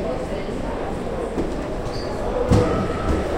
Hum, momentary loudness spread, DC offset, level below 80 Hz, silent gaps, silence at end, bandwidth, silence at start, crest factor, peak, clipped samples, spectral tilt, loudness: none; 9 LU; under 0.1%; -30 dBFS; none; 0 s; 16 kHz; 0 s; 18 dB; -4 dBFS; under 0.1%; -7 dB/octave; -24 LUFS